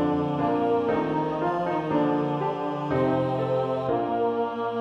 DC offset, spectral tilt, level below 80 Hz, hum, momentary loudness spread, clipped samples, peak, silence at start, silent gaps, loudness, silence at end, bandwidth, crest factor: under 0.1%; -8.5 dB/octave; -56 dBFS; none; 3 LU; under 0.1%; -10 dBFS; 0 s; none; -26 LUFS; 0 s; 7.2 kHz; 14 dB